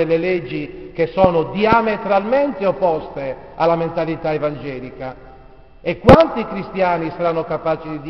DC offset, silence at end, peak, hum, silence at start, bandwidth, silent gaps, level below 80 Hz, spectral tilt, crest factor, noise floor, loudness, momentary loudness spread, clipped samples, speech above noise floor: 0.4%; 0 s; 0 dBFS; none; 0 s; 6.4 kHz; none; -38 dBFS; -5.5 dB/octave; 18 dB; -44 dBFS; -18 LUFS; 15 LU; 0.1%; 26 dB